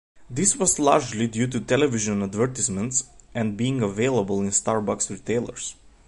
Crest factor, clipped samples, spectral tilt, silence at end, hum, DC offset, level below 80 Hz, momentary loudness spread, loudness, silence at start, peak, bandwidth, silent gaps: 22 dB; under 0.1%; -4 dB/octave; 0.35 s; none; under 0.1%; -52 dBFS; 9 LU; -23 LUFS; 0.15 s; -2 dBFS; 11.5 kHz; none